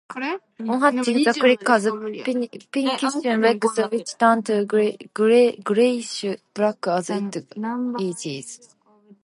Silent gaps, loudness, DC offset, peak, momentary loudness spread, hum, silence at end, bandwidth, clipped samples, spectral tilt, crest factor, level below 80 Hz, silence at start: none; -21 LUFS; under 0.1%; -2 dBFS; 11 LU; none; 0.7 s; 11.5 kHz; under 0.1%; -4.5 dB/octave; 18 dB; -76 dBFS; 0.1 s